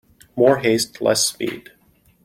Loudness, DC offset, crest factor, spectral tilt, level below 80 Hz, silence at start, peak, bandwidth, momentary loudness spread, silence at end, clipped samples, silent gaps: -19 LUFS; under 0.1%; 18 dB; -3.5 dB/octave; -60 dBFS; 0.35 s; -4 dBFS; 16.5 kHz; 15 LU; 0.65 s; under 0.1%; none